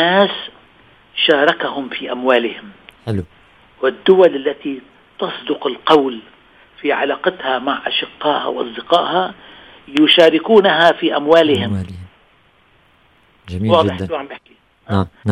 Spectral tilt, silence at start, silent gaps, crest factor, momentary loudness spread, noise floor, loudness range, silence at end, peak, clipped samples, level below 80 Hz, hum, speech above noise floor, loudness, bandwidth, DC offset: -6 dB/octave; 0 s; none; 16 dB; 16 LU; -53 dBFS; 6 LU; 0 s; 0 dBFS; under 0.1%; -54 dBFS; none; 38 dB; -15 LUFS; 11 kHz; under 0.1%